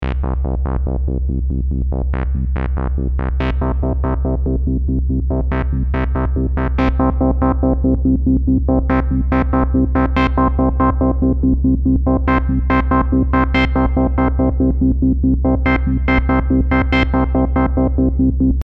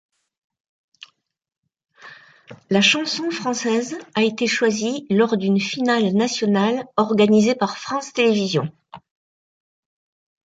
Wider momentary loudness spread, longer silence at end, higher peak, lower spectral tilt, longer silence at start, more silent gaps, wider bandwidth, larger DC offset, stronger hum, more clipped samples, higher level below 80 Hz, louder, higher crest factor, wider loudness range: second, 5 LU vs 8 LU; second, 0 s vs 1.5 s; about the same, -4 dBFS vs -2 dBFS; first, -10 dB/octave vs -4.5 dB/octave; second, 0 s vs 2.05 s; neither; second, 5.6 kHz vs 9 kHz; neither; neither; neither; first, -18 dBFS vs -66 dBFS; about the same, -17 LUFS vs -19 LUFS; second, 12 dB vs 20 dB; about the same, 4 LU vs 4 LU